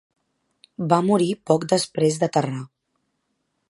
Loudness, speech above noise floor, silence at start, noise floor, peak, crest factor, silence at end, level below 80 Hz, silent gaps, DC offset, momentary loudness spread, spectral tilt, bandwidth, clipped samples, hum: -21 LUFS; 53 dB; 0.8 s; -74 dBFS; -2 dBFS; 22 dB; 1.05 s; -68 dBFS; none; under 0.1%; 12 LU; -5.5 dB/octave; 11.5 kHz; under 0.1%; none